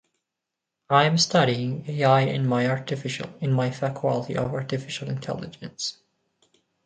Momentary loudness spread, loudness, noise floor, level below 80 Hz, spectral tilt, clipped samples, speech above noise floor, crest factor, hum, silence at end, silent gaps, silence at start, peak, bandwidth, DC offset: 12 LU; -24 LUFS; -85 dBFS; -62 dBFS; -5 dB/octave; under 0.1%; 61 dB; 22 dB; none; 0.95 s; none; 0.9 s; -2 dBFS; 9.2 kHz; under 0.1%